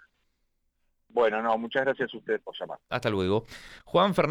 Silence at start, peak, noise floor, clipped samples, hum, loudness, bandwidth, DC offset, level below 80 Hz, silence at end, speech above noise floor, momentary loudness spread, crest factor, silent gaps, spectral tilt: 1.15 s; -10 dBFS; -75 dBFS; under 0.1%; none; -28 LUFS; 14 kHz; under 0.1%; -60 dBFS; 0 s; 47 dB; 13 LU; 18 dB; none; -6.5 dB/octave